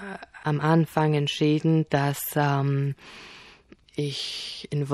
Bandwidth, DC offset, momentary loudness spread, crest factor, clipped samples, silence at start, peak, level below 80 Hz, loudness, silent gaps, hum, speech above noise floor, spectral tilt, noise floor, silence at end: 15 kHz; under 0.1%; 17 LU; 20 dB; under 0.1%; 0 s; -6 dBFS; -62 dBFS; -25 LUFS; none; none; 28 dB; -6 dB/octave; -53 dBFS; 0 s